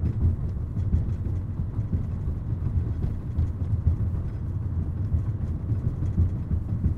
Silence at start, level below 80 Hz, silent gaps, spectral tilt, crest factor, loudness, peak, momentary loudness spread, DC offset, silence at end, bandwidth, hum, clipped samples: 0 s; -32 dBFS; none; -11 dB/octave; 16 dB; -28 LUFS; -10 dBFS; 4 LU; under 0.1%; 0 s; 2.6 kHz; none; under 0.1%